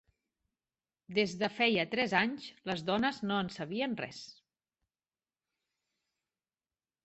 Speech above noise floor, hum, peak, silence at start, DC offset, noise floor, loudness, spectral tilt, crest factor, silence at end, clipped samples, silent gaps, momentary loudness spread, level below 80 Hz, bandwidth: over 57 dB; none; -12 dBFS; 1.1 s; under 0.1%; under -90 dBFS; -33 LUFS; -5 dB/octave; 24 dB; 2.75 s; under 0.1%; none; 12 LU; -72 dBFS; 8.2 kHz